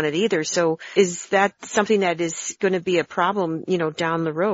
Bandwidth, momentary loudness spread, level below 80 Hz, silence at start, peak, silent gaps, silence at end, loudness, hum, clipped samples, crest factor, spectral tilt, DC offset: 8 kHz; 4 LU; -66 dBFS; 0 s; -4 dBFS; none; 0 s; -22 LUFS; none; under 0.1%; 16 dB; -4 dB/octave; under 0.1%